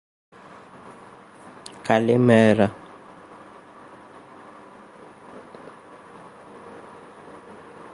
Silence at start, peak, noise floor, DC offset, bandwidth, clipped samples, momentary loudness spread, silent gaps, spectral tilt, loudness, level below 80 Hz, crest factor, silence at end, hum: 1.85 s; -2 dBFS; -46 dBFS; under 0.1%; 11.5 kHz; under 0.1%; 28 LU; none; -7 dB/octave; -19 LUFS; -62 dBFS; 24 dB; 1.25 s; none